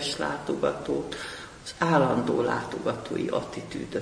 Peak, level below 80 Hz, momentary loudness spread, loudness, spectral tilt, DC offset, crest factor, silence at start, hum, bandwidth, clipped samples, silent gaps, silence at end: -8 dBFS; -56 dBFS; 13 LU; -28 LUFS; -5.5 dB/octave; under 0.1%; 20 dB; 0 s; none; 10.5 kHz; under 0.1%; none; 0 s